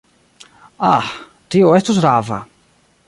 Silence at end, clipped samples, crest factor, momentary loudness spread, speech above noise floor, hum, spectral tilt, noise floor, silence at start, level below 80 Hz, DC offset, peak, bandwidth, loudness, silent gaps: 0.65 s; under 0.1%; 16 dB; 15 LU; 42 dB; none; -6 dB/octave; -56 dBFS; 0.8 s; -54 dBFS; under 0.1%; -2 dBFS; 11.5 kHz; -15 LUFS; none